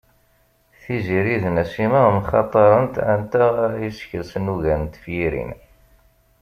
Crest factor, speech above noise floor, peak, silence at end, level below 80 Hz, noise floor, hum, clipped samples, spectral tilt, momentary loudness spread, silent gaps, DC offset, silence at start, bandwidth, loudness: 18 dB; 41 dB; -2 dBFS; 0.85 s; -42 dBFS; -60 dBFS; none; under 0.1%; -8.5 dB/octave; 13 LU; none; under 0.1%; 0.85 s; 15 kHz; -20 LUFS